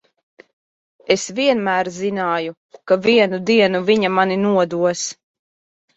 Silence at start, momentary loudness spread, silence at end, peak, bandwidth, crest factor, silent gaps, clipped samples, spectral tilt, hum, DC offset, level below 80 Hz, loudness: 1.1 s; 8 LU; 0.85 s; -2 dBFS; 8.2 kHz; 18 dB; 2.57-2.69 s; under 0.1%; -4.5 dB/octave; none; under 0.1%; -62 dBFS; -18 LUFS